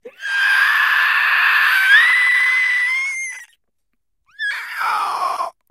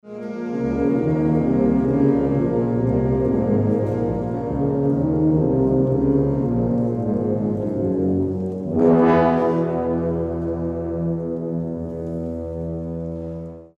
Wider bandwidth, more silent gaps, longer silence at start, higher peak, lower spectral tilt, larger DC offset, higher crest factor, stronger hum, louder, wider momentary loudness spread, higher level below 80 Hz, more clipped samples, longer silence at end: first, 16 kHz vs 6.6 kHz; neither; about the same, 0.05 s vs 0.05 s; first, 0 dBFS vs -4 dBFS; second, 3 dB/octave vs -11 dB/octave; neither; about the same, 16 dB vs 16 dB; neither; first, -14 LUFS vs -21 LUFS; first, 14 LU vs 10 LU; second, -76 dBFS vs -40 dBFS; neither; about the same, 0.2 s vs 0.1 s